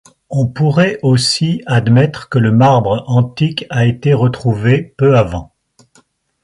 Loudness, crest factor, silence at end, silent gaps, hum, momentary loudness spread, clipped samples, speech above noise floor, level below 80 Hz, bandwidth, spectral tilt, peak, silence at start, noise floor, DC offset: -13 LUFS; 12 dB; 1 s; none; none; 7 LU; under 0.1%; 41 dB; -42 dBFS; 11.5 kHz; -6.5 dB/octave; 0 dBFS; 0.3 s; -53 dBFS; under 0.1%